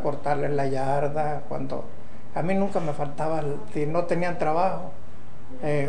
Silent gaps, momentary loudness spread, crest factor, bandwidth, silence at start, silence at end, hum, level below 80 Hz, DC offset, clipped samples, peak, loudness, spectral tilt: none; 18 LU; 16 dB; 10 kHz; 0 s; 0 s; none; -52 dBFS; 6%; under 0.1%; -10 dBFS; -27 LUFS; -7.5 dB/octave